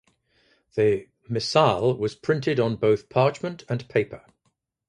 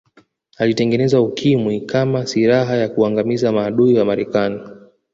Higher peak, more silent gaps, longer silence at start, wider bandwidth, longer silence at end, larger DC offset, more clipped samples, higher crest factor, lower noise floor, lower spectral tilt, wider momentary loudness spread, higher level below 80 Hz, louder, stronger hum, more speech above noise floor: about the same, -4 dBFS vs -2 dBFS; neither; first, 0.75 s vs 0.6 s; first, 10.5 kHz vs 7.8 kHz; first, 0.7 s vs 0.35 s; neither; neither; first, 22 dB vs 14 dB; first, -73 dBFS vs -54 dBFS; about the same, -6 dB/octave vs -7 dB/octave; first, 12 LU vs 5 LU; about the same, -58 dBFS vs -54 dBFS; second, -24 LUFS vs -17 LUFS; neither; first, 50 dB vs 38 dB